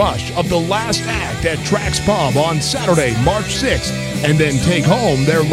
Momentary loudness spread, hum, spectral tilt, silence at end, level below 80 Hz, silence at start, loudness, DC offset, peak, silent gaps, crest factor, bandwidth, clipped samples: 5 LU; none; -5 dB/octave; 0 s; -32 dBFS; 0 s; -16 LUFS; under 0.1%; -2 dBFS; none; 14 dB; 16 kHz; under 0.1%